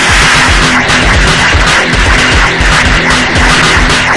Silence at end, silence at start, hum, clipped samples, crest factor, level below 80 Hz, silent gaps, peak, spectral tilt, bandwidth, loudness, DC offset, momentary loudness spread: 0 s; 0 s; none; 3%; 6 dB; -14 dBFS; none; 0 dBFS; -3 dB/octave; 12 kHz; -6 LUFS; under 0.1%; 2 LU